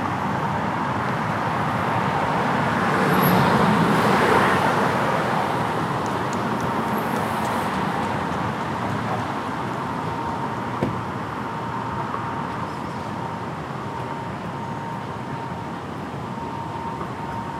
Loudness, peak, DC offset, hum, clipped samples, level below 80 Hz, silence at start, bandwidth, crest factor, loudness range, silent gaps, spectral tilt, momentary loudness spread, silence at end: -24 LUFS; -4 dBFS; under 0.1%; none; under 0.1%; -50 dBFS; 0 s; 16 kHz; 18 dB; 11 LU; none; -6 dB/octave; 12 LU; 0 s